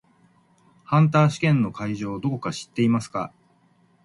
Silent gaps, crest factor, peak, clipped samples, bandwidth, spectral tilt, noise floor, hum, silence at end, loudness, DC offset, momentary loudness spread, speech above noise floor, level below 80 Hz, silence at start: none; 18 dB; -6 dBFS; under 0.1%; 11.5 kHz; -7 dB/octave; -61 dBFS; none; 0.75 s; -23 LUFS; under 0.1%; 12 LU; 39 dB; -60 dBFS; 0.9 s